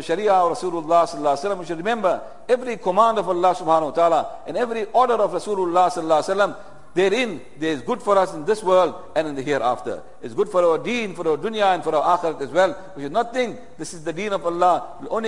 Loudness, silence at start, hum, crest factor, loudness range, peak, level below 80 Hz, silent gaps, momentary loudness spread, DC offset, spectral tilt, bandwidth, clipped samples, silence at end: -21 LUFS; 0 s; none; 18 dB; 2 LU; -4 dBFS; -58 dBFS; none; 10 LU; 1%; -4.5 dB/octave; 11.5 kHz; under 0.1%; 0 s